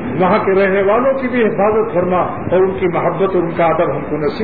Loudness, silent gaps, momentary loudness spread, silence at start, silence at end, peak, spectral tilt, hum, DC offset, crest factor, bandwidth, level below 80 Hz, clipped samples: -15 LUFS; none; 4 LU; 0 s; 0 s; -2 dBFS; -10.5 dB/octave; none; 2%; 12 dB; 4.9 kHz; -42 dBFS; under 0.1%